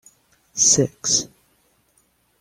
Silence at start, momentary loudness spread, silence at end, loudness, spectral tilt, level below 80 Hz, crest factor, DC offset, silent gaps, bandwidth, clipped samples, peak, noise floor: 0.55 s; 18 LU; 1.15 s; -17 LUFS; -2.5 dB/octave; -58 dBFS; 20 dB; under 0.1%; none; 16 kHz; under 0.1%; -4 dBFS; -63 dBFS